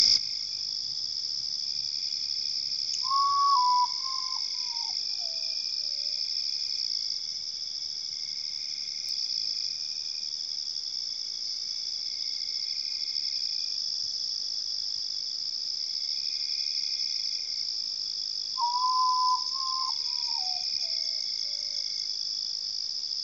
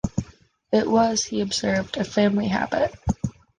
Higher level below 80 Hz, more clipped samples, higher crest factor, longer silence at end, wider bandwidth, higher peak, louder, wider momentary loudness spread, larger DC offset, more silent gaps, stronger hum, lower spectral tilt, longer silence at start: second, -76 dBFS vs -42 dBFS; neither; first, 22 dB vs 16 dB; second, 0 s vs 0.3 s; about the same, 9 kHz vs 9.8 kHz; about the same, -8 dBFS vs -6 dBFS; second, -28 LUFS vs -23 LUFS; about the same, 6 LU vs 8 LU; neither; neither; neither; second, 2.5 dB/octave vs -4.5 dB/octave; about the same, 0 s vs 0.05 s